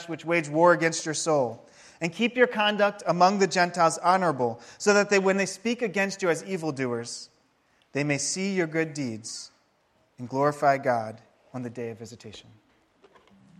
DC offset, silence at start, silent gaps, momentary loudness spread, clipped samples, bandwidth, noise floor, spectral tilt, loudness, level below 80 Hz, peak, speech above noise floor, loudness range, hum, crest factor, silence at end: under 0.1%; 0 s; none; 17 LU; under 0.1%; 13 kHz; -67 dBFS; -4 dB/octave; -25 LUFS; -74 dBFS; -6 dBFS; 42 dB; 7 LU; none; 20 dB; 1.2 s